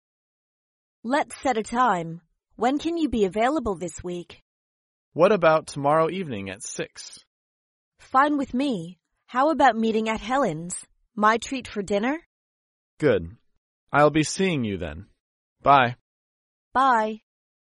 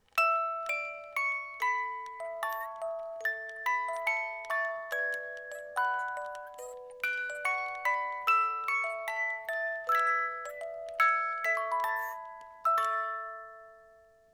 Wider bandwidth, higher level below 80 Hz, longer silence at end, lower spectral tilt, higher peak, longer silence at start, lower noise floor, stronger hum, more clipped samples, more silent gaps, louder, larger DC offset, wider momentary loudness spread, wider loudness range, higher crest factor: second, 11.5 kHz vs 20 kHz; first, -54 dBFS vs -76 dBFS; about the same, 0.5 s vs 0.4 s; first, -5 dB/octave vs 0.5 dB/octave; first, -4 dBFS vs -14 dBFS; first, 1.05 s vs 0.15 s; first, under -90 dBFS vs -60 dBFS; neither; neither; first, 4.42-5.12 s, 7.27-7.92 s, 12.26-12.97 s, 13.57-13.87 s, 15.20-15.56 s, 16.01-16.71 s vs none; first, -23 LUFS vs -32 LUFS; neither; first, 16 LU vs 13 LU; about the same, 3 LU vs 4 LU; about the same, 20 dB vs 20 dB